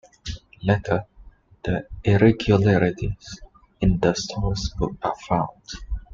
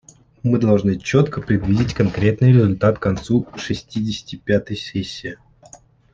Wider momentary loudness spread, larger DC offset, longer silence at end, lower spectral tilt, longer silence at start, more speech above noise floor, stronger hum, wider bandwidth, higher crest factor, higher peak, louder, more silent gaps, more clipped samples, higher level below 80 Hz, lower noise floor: first, 18 LU vs 12 LU; neither; second, 0 s vs 0.8 s; about the same, -6.5 dB/octave vs -7.5 dB/octave; second, 0.25 s vs 0.45 s; about the same, 27 dB vs 29 dB; neither; about the same, 7.6 kHz vs 7.6 kHz; about the same, 18 dB vs 16 dB; about the same, -4 dBFS vs -2 dBFS; second, -23 LUFS vs -19 LUFS; neither; neither; first, -36 dBFS vs -44 dBFS; about the same, -49 dBFS vs -47 dBFS